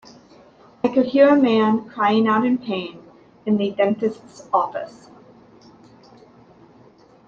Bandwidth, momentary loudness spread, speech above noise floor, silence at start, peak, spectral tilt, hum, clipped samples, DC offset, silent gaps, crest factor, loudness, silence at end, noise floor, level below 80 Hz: 7.6 kHz; 17 LU; 32 dB; 0.85 s; -2 dBFS; -7 dB/octave; none; under 0.1%; under 0.1%; none; 18 dB; -19 LUFS; 2.4 s; -51 dBFS; -66 dBFS